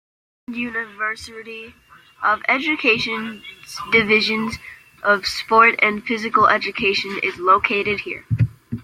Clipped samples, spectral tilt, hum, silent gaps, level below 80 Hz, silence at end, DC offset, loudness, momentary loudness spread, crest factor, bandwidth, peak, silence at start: under 0.1%; -5 dB/octave; none; none; -52 dBFS; 0 s; under 0.1%; -18 LUFS; 18 LU; 20 dB; 16 kHz; -2 dBFS; 0.5 s